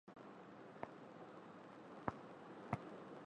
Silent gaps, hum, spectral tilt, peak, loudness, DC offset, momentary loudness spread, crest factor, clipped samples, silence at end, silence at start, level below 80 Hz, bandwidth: none; none; -7.5 dB/octave; -22 dBFS; -53 LUFS; under 0.1%; 10 LU; 32 dB; under 0.1%; 0 s; 0.05 s; -76 dBFS; 9.6 kHz